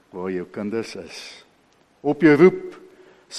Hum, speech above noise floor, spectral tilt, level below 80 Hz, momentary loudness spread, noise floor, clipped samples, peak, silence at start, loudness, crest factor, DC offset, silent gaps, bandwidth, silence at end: none; 39 dB; -6.5 dB/octave; -64 dBFS; 23 LU; -59 dBFS; under 0.1%; -2 dBFS; 0.15 s; -19 LUFS; 20 dB; under 0.1%; none; 10.5 kHz; 0 s